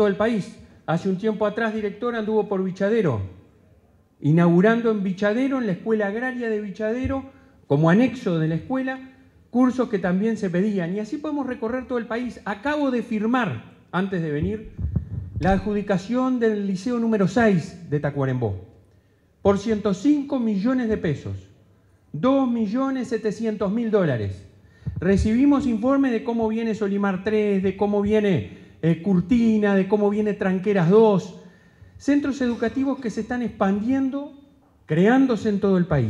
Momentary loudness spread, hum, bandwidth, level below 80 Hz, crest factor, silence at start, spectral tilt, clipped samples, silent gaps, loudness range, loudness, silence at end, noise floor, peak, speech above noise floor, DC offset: 10 LU; none; 10.5 kHz; -44 dBFS; 18 dB; 0 s; -8 dB/octave; under 0.1%; none; 4 LU; -22 LUFS; 0 s; -58 dBFS; -6 dBFS; 37 dB; under 0.1%